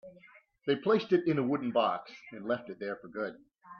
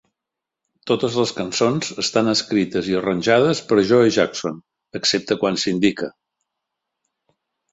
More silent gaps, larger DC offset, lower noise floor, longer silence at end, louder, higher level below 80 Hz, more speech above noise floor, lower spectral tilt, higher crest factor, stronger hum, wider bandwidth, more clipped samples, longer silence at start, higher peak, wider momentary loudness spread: neither; neither; second, -60 dBFS vs -85 dBFS; second, 0 s vs 1.65 s; second, -32 LUFS vs -19 LUFS; second, -76 dBFS vs -58 dBFS; second, 29 dB vs 66 dB; first, -8 dB/octave vs -4.5 dB/octave; about the same, 18 dB vs 18 dB; neither; second, 6.6 kHz vs 8.2 kHz; neither; second, 0.05 s vs 0.85 s; second, -14 dBFS vs -2 dBFS; about the same, 12 LU vs 13 LU